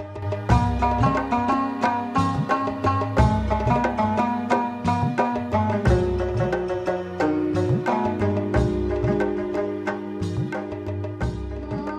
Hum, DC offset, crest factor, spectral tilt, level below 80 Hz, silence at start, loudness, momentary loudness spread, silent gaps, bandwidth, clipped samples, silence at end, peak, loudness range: none; under 0.1%; 18 dB; -8 dB/octave; -34 dBFS; 0 s; -23 LUFS; 8 LU; none; 10 kHz; under 0.1%; 0 s; -4 dBFS; 3 LU